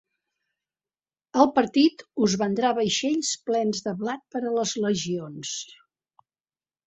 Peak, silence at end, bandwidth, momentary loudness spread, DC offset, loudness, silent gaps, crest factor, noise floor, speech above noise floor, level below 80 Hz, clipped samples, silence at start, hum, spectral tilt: -4 dBFS; 1.15 s; 8.4 kHz; 11 LU; under 0.1%; -25 LUFS; none; 22 dB; under -90 dBFS; over 66 dB; -66 dBFS; under 0.1%; 1.35 s; none; -4 dB/octave